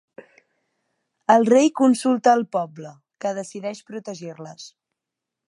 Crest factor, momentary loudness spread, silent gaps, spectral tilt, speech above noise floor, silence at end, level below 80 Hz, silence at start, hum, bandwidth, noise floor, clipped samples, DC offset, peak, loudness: 20 dB; 22 LU; none; -5 dB/octave; 65 dB; 0.8 s; -78 dBFS; 1.3 s; none; 11.5 kHz; -85 dBFS; under 0.1%; under 0.1%; -2 dBFS; -20 LUFS